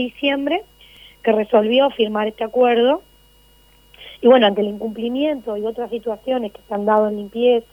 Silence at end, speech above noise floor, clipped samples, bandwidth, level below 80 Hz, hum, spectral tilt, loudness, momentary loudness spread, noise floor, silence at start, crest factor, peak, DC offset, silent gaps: 0.1 s; 34 dB; under 0.1%; 16 kHz; -56 dBFS; none; -6.5 dB/octave; -19 LUFS; 11 LU; -52 dBFS; 0 s; 18 dB; -2 dBFS; under 0.1%; none